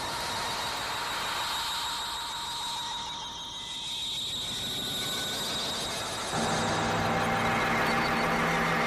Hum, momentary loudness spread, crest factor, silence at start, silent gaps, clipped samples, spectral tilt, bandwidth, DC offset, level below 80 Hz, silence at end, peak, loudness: none; 7 LU; 16 dB; 0 s; none; under 0.1%; -2.5 dB/octave; 15.5 kHz; under 0.1%; -52 dBFS; 0 s; -14 dBFS; -29 LUFS